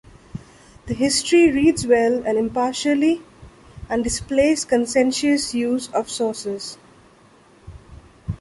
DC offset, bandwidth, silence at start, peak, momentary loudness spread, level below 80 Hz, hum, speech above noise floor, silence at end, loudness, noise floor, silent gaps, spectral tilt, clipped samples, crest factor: under 0.1%; 11.5 kHz; 0.35 s; -4 dBFS; 17 LU; -44 dBFS; none; 32 dB; 0.05 s; -20 LUFS; -51 dBFS; none; -4 dB/octave; under 0.1%; 16 dB